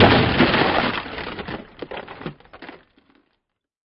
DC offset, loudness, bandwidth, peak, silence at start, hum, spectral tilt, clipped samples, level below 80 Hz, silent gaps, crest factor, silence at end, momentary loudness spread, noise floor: under 0.1%; -19 LUFS; 5.8 kHz; 0 dBFS; 0 s; none; -9 dB/octave; under 0.1%; -42 dBFS; none; 22 dB; 1.15 s; 25 LU; -76 dBFS